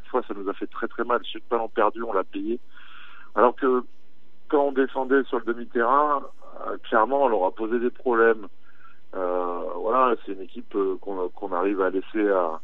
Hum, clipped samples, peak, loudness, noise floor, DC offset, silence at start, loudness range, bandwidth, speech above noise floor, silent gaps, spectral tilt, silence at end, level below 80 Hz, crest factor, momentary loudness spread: none; under 0.1%; -4 dBFS; -25 LUFS; -63 dBFS; 2%; 0.1 s; 3 LU; 4.2 kHz; 39 dB; none; -7.5 dB/octave; 0.05 s; -74 dBFS; 20 dB; 11 LU